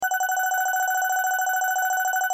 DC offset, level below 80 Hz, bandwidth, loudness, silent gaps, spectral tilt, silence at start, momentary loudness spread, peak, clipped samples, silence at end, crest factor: under 0.1%; -82 dBFS; 16 kHz; -23 LUFS; none; 3.5 dB/octave; 0 s; 0 LU; -14 dBFS; under 0.1%; 0 s; 10 dB